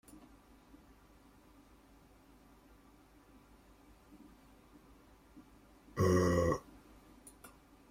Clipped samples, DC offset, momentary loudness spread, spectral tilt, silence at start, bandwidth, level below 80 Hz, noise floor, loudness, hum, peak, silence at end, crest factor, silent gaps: under 0.1%; under 0.1%; 30 LU; -6.5 dB/octave; 5.35 s; 16 kHz; -62 dBFS; -63 dBFS; -33 LUFS; none; -18 dBFS; 0.45 s; 24 dB; none